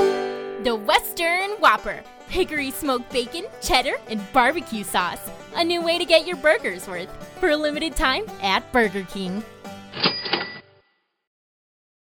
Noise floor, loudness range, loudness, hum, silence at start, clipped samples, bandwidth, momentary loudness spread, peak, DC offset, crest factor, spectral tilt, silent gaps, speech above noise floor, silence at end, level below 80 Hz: -66 dBFS; 3 LU; -22 LUFS; none; 0 s; under 0.1%; over 20 kHz; 14 LU; -4 dBFS; under 0.1%; 20 dB; -3 dB/octave; none; 43 dB; 1.45 s; -44 dBFS